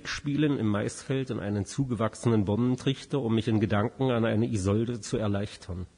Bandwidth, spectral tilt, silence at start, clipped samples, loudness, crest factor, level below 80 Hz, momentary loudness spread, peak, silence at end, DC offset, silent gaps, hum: 10.5 kHz; -6.5 dB/octave; 0.05 s; under 0.1%; -28 LUFS; 16 dB; -54 dBFS; 5 LU; -12 dBFS; 0.1 s; under 0.1%; none; none